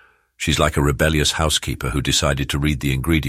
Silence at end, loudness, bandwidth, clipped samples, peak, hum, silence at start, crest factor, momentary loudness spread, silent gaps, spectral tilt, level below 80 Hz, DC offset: 0 s; -19 LUFS; 16 kHz; under 0.1%; -2 dBFS; none; 0.4 s; 18 dB; 5 LU; none; -4 dB/octave; -28 dBFS; under 0.1%